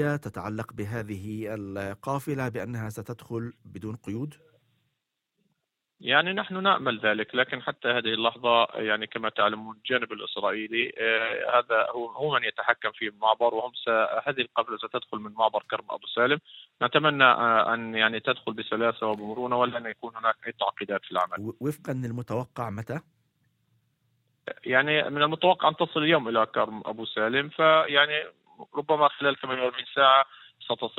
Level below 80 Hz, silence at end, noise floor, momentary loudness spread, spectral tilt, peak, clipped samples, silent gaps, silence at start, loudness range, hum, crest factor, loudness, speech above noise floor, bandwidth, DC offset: -70 dBFS; 0.1 s; -81 dBFS; 13 LU; -5.5 dB/octave; -4 dBFS; under 0.1%; none; 0 s; 10 LU; none; 22 dB; -26 LUFS; 55 dB; 16.5 kHz; under 0.1%